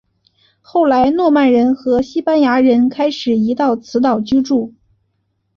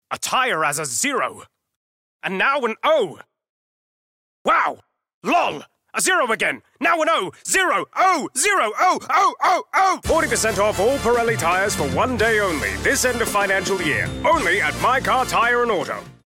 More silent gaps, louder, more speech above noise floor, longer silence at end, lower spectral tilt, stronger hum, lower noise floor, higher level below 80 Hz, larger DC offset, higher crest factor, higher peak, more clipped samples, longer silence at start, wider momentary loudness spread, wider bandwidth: second, none vs 1.76-2.20 s, 3.49-4.45 s, 5.14-5.21 s; first, -14 LUFS vs -19 LUFS; second, 53 dB vs over 70 dB; first, 0.9 s vs 0.15 s; first, -6 dB/octave vs -2.5 dB/octave; neither; second, -66 dBFS vs under -90 dBFS; second, -50 dBFS vs -44 dBFS; neither; about the same, 12 dB vs 12 dB; first, -2 dBFS vs -8 dBFS; neither; first, 0.75 s vs 0.1 s; about the same, 6 LU vs 5 LU; second, 7 kHz vs 17 kHz